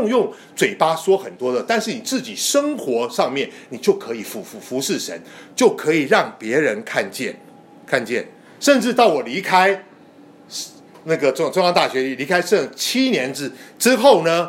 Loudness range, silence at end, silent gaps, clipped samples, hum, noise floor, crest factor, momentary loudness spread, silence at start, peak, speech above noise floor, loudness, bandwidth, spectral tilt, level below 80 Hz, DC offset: 3 LU; 0 s; none; under 0.1%; none; -46 dBFS; 18 dB; 13 LU; 0 s; 0 dBFS; 27 dB; -19 LUFS; 16.5 kHz; -3.5 dB/octave; -72 dBFS; under 0.1%